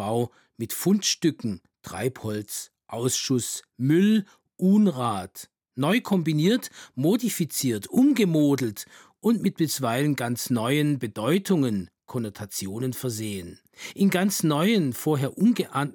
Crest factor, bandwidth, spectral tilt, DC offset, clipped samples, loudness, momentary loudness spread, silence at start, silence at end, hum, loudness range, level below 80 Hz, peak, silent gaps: 16 dB; 19.5 kHz; -5 dB/octave; under 0.1%; under 0.1%; -25 LUFS; 13 LU; 0 s; 0 s; none; 3 LU; -72 dBFS; -10 dBFS; none